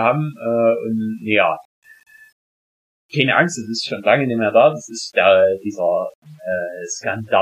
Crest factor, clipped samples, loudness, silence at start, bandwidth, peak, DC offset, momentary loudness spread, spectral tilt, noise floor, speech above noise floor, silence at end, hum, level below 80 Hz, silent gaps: 16 dB; under 0.1%; -18 LUFS; 0 s; 11.5 kHz; -2 dBFS; under 0.1%; 12 LU; -4.5 dB/octave; under -90 dBFS; over 72 dB; 0 s; none; -68 dBFS; 1.65-1.82 s, 2.32-3.09 s, 6.15-6.22 s